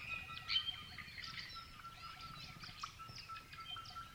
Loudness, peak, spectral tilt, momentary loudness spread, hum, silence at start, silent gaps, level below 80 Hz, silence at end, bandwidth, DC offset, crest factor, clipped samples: -45 LUFS; -26 dBFS; -2 dB/octave; 14 LU; none; 0 s; none; -66 dBFS; 0 s; over 20 kHz; under 0.1%; 24 dB; under 0.1%